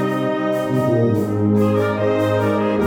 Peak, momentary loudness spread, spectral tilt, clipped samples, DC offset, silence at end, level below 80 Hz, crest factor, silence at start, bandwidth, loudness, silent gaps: -6 dBFS; 3 LU; -8 dB/octave; under 0.1%; under 0.1%; 0 s; -52 dBFS; 12 dB; 0 s; 17.5 kHz; -18 LUFS; none